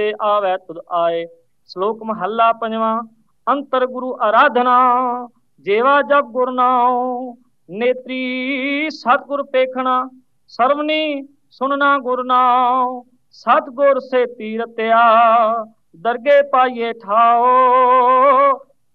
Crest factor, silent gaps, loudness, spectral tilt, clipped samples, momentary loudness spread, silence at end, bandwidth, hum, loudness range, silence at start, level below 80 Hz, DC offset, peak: 14 dB; none; -16 LUFS; -6 dB/octave; under 0.1%; 13 LU; 0.35 s; 6.4 kHz; none; 6 LU; 0 s; -80 dBFS; 0.1%; -2 dBFS